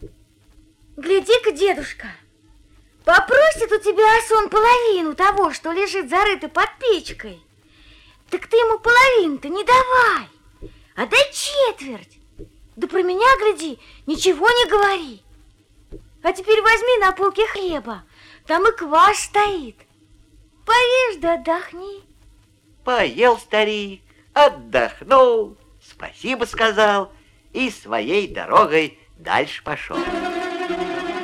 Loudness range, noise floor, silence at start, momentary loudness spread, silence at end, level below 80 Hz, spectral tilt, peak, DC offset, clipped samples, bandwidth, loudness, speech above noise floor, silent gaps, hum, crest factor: 4 LU; -54 dBFS; 0 s; 17 LU; 0 s; -46 dBFS; -2.5 dB/octave; -4 dBFS; under 0.1%; under 0.1%; 15.5 kHz; -17 LUFS; 36 dB; none; none; 16 dB